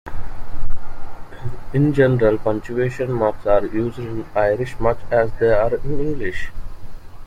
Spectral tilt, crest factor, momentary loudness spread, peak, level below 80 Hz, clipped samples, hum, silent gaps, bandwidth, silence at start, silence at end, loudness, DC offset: -8.5 dB/octave; 14 dB; 20 LU; -2 dBFS; -30 dBFS; under 0.1%; none; none; 7.2 kHz; 0.05 s; 0 s; -20 LUFS; under 0.1%